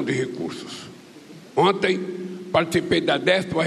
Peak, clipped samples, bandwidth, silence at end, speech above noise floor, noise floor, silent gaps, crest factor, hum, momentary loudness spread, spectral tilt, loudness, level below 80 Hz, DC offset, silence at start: -6 dBFS; under 0.1%; 13.5 kHz; 0 s; 22 dB; -44 dBFS; none; 18 dB; none; 15 LU; -5 dB/octave; -22 LUFS; -58 dBFS; under 0.1%; 0 s